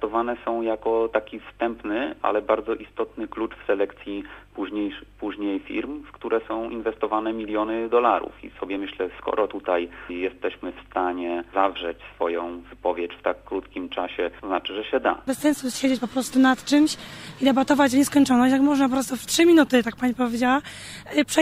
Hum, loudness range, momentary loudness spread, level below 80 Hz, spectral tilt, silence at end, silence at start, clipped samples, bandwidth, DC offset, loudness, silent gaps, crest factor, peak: none; 9 LU; 13 LU; -54 dBFS; -3.5 dB/octave; 0 s; 0 s; under 0.1%; 16 kHz; under 0.1%; -24 LUFS; none; 18 dB; -4 dBFS